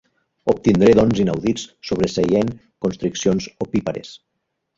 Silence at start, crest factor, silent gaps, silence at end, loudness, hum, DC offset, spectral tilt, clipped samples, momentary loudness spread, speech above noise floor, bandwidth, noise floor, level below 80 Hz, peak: 0.45 s; 18 dB; none; 0.6 s; -19 LUFS; none; under 0.1%; -6 dB/octave; under 0.1%; 13 LU; 57 dB; 7.8 kHz; -75 dBFS; -46 dBFS; -2 dBFS